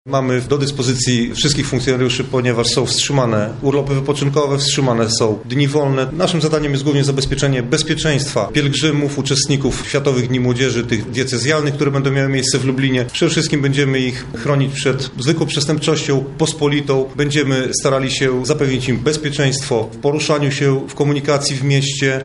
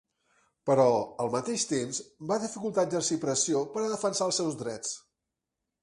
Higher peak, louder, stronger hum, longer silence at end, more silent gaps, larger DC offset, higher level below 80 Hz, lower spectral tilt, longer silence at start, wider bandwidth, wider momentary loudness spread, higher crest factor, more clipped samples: first, -2 dBFS vs -10 dBFS; first, -16 LUFS vs -29 LUFS; neither; second, 0 s vs 0.85 s; neither; neither; first, -40 dBFS vs -72 dBFS; about the same, -4.5 dB/octave vs -4 dB/octave; second, 0.05 s vs 0.65 s; about the same, 11.5 kHz vs 11.5 kHz; second, 3 LU vs 11 LU; second, 14 dB vs 20 dB; neither